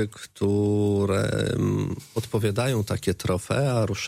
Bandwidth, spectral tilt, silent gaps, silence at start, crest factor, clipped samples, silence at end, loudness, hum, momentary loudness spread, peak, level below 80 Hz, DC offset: 16 kHz; -6 dB/octave; none; 0 s; 14 dB; under 0.1%; 0 s; -25 LUFS; none; 6 LU; -12 dBFS; -50 dBFS; under 0.1%